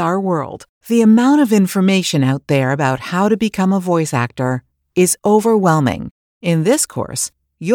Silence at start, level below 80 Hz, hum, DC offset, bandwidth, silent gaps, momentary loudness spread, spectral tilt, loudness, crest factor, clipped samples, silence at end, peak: 0 s; -52 dBFS; none; under 0.1%; 19.5 kHz; 0.69-0.81 s, 6.11-6.41 s; 12 LU; -5.5 dB/octave; -15 LUFS; 14 dB; under 0.1%; 0 s; 0 dBFS